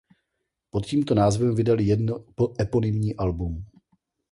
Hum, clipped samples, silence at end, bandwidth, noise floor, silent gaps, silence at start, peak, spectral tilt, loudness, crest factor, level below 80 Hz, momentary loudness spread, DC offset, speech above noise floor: none; under 0.1%; 0.65 s; 11.5 kHz; -80 dBFS; none; 0.75 s; -8 dBFS; -7.5 dB/octave; -24 LUFS; 16 dB; -42 dBFS; 10 LU; under 0.1%; 57 dB